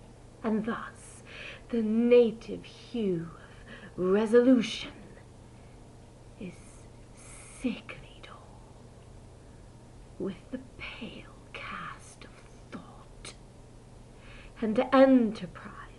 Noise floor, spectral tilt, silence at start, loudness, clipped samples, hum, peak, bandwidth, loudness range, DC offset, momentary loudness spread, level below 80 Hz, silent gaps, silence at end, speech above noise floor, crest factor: -51 dBFS; -6 dB/octave; 0.4 s; -28 LUFS; under 0.1%; none; -8 dBFS; 11.5 kHz; 16 LU; under 0.1%; 27 LU; -56 dBFS; none; 0.05 s; 24 dB; 22 dB